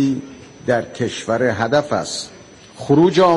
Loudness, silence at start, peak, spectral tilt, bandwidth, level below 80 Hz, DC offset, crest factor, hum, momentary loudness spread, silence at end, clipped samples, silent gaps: -19 LUFS; 0 s; -4 dBFS; -5.5 dB/octave; 11.5 kHz; -54 dBFS; under 0.1%; 14 dB; none; 16 LU; 0 s; under 0.1%; none